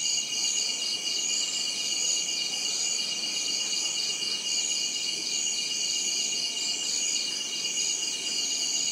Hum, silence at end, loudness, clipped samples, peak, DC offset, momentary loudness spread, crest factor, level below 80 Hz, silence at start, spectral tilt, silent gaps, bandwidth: none; 0 s; -26 LUFS; under 0.1%; -16 dBFS; under 0.1%; 2 LU; 14 dB; -86 dBFS; 0 s; 2 dB/octave; none; 16 kHz